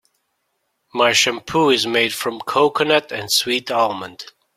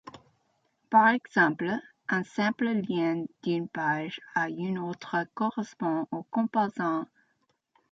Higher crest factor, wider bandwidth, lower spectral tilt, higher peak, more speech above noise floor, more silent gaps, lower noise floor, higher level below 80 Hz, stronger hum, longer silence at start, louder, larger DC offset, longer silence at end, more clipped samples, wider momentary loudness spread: about the same, 18 dB vs 20 dB; first, 16.5 kHz vs 7.8 kHz; second, -2.5 dB/octave vs -6.5 dB/octave; first, -2 dBFS vs -8 dBFS; first, 53 dB vs 46 dB; neither; about the same, -71 dBFS vs -74 dBFS; first, -60 dBFS vs -76 dBFS; neither; first, 0.95 s vs 0.05 s; first, -17 LUFS vs -28 LUFS; neither; second, 0.3 s vs 0.85 s; neither; first, 12 LU vs 9 LU